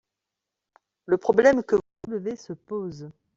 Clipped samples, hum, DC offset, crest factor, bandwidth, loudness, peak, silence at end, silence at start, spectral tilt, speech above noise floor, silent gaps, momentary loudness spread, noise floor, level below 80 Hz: under 0.1%; none; under 0.1%; 22 dB; 7.8 kHz; -24 LUFS; -4 dBFS; 0.25 s; 1.1 s; -6.5 dB/octave; 63 dB; none; 18 LU; -86 dBFS; -62 dBFS